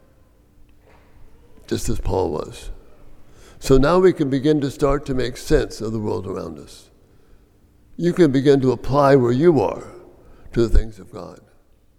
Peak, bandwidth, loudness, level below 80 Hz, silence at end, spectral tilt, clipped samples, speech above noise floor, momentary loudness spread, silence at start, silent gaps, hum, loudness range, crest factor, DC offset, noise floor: -2 dBFS; 15.5 kHz; -19 LUFS; -30 dBFS; 0.65 s; -7 dB/octave; under 0.1%; 35 dB; 21 LU; 1.2 s; none; none; 8 LU; 18 dB; under 0.1%; -53 dBFS